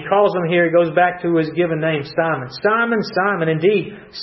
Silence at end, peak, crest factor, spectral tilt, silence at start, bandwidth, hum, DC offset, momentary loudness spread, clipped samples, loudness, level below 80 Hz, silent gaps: 0 s; -4 dBFS; 14 dB; -8 dB/octave; 0 s; 6 kHz; none; under 0.1%; 5 LU; under 0.1%; -17 LUFS; -58 dBFS; none